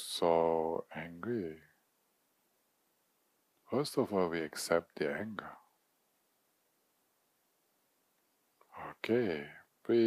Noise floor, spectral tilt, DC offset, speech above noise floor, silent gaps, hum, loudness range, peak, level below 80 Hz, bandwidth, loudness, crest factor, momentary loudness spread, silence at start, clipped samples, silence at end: -77 dBFS; -5 dB/octave; under 0.1%; 43 dB; none; none; 8 LU; -16 dBFS; -74 dBFS; 15.5 kHz; -35 LUFS; 22 dB; 18 LU; 0 s; under 0.1%; 0 s